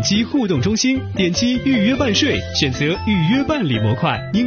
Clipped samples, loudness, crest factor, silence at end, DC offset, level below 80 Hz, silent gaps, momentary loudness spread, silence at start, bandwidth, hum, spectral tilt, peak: under 0.1%; -17 LUFS; 16 dB; 0 s; 0.2%; -40 dBFS; none; 3 LU; 0 s; 6.8 kHz; none; -4.5 dB/octave; -2 dBFS